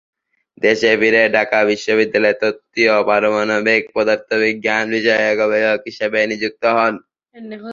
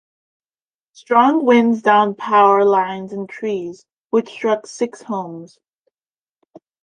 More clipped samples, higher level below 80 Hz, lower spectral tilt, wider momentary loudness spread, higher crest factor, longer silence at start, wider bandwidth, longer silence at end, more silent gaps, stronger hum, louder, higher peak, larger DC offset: neither; first, -60 dBFS vs -70 dBFS; second, -4 dB/octave vs -5.5 dB/octave; second, 6 LU vs 14 LU; about the same, 16 dB vs 16 dB; second, 0.6 s vs 1.1 s; second, 7.6 kHz vs 9.6 kHz; second, 0 s vs 1.4 s; second, none vs 3.98-4.10 s; neither; about the same, -16 LUFS vs -17 LUFS; about the same, 0 dBFS vs -2 dBFS; neither